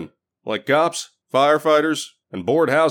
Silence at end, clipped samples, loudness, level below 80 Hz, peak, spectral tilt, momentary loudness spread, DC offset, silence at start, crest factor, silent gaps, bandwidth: 0 s; under 0.1%; -19 LUFS; -70 dBFS; -4 dBFS; -4 dB/octave; 15 LU; under 0.1%; 0 s; 16 dB; none; 17.5 kHz